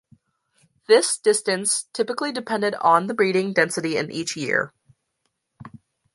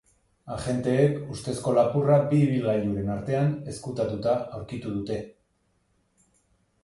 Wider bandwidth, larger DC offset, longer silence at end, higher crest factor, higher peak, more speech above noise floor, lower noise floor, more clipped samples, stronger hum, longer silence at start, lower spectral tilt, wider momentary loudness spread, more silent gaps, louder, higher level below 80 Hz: about the same, 11.5 kHz vs 11.5 kHz; neither; second, 0.45 s vs 1.55 s; about the same, 20 dB vs 18 dB; first, -4 dBFS vs -8 dBFS; first, 54 dB vs 45 dB; first, -75 dBFS vs -70 dBFS; neither; neither; first, 0.9 s vs 0.45 s; second, -3 dB/octave vs -7.5 dB/octave; second, 8 LU vs 13 LU; neither; first, -21 LUFS vs -26 LUFS; second, -70 dBFS vs -54 dBFS